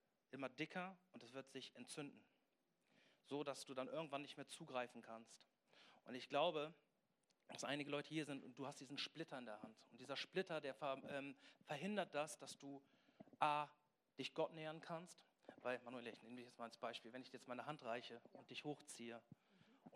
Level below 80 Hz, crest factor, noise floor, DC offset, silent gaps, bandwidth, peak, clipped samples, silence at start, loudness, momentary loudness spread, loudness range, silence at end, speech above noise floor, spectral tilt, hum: under -90 dBFS; 26 dB; -87 dBFS; under 0.1%; none; 13.5 kHz; -24 dBFS; under 0.1%; 0.35 s; -50 LUFS; 15 LU; 5 LU; 0 s; 36 dB; -4 dB/octave; none